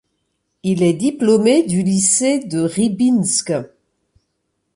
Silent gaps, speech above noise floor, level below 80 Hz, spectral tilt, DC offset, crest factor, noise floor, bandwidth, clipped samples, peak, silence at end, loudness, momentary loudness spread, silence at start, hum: none; 56 dB; -58 dBFS; -4.5 dB/octave; under 0.1%; 14 dB; -71 dBFS; 11.5 kHz; under 0.1%; -4 dBFS; 1.1 s; -16 LUFS; 8 LU; 0.65 s; none